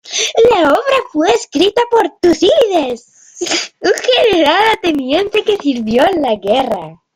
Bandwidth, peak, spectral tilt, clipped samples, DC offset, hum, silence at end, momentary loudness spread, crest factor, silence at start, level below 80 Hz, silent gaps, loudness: 16 kHz; 0 dBFS; -3 dB/octave; under 0.1%; under 0.1%; none; 0.2 s; 7 LU; 12 dB; 0.05 s; -48 dBFS; none; -12 LUFS